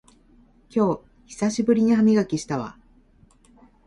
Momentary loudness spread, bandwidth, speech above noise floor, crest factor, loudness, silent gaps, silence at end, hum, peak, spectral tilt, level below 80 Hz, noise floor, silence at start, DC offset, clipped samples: 14 LU; 11 kHz; 35 dB; 16 dB; -22 LUFS; none; 1.15 s; none; -8 dBFS; -6.5 dB/octave; -56 dBFS; -56 dBFS; 0.75 s; under 0.1%; under 0.1%